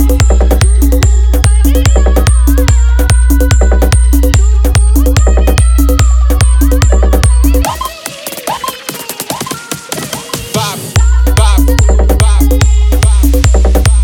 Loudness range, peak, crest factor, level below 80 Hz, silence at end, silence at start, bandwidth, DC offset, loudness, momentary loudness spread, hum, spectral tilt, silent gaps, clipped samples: 6 LU; 0 dBFS; 8 dB; -8 dBFS; 0 s; 0 s; 17.5 kHz; under 0.1%; -10 LUFS; 9 LU; none; -5 dB/octave; none; under 0.1%